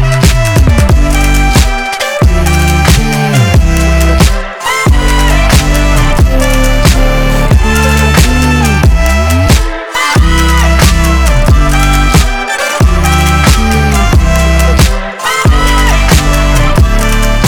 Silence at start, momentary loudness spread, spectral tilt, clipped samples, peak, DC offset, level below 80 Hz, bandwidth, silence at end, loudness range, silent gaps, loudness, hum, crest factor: 0 s; 3 LU; -5 dB/octave; 0.6%; 0 dBFS; under 0.1%; -10 dBFS; 19.5 kHz; 0 s; 1 LU; none; -8 LUFS; none; 6 dB